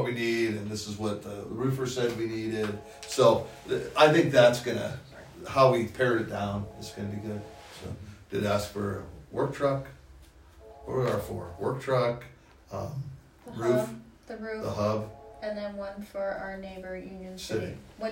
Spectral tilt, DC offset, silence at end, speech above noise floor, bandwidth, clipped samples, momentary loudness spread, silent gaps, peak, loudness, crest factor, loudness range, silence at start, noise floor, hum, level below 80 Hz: -5.5 dB/octave; under 0.1%; 0 s; 24 dB; 16 kHz; under 0.1%; 19 LU; none; -6 dBFS; -29 LUFS; 22 dB; 10 LU; 0 s; -53 dBFS; none; -56 dBFS